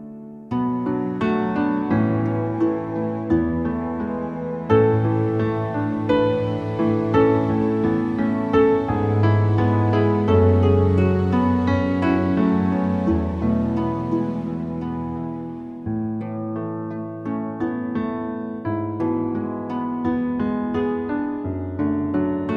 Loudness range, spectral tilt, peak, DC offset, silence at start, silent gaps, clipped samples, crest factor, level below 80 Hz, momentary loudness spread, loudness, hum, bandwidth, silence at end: 9 LU; -10 dB/octave; -4 dBFS; under 0.1%; 0 s; none; under 0.1%; 16 dB; -44 dBFS; 10 LU; -22 LUFS; none; 6.2 kHz; 0 s